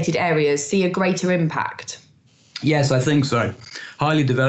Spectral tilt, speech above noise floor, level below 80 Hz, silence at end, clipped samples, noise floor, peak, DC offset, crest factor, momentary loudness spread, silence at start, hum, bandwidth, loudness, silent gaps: -5.5 dB/octave; 35 dB; -58 dBFS; 0 s; under 0.1%; -55 dBFS; -6 dBFS; under 0.1%; 14 dB; 16 LU; 0 s; none; 8.4 kHz; -20 LUFS; none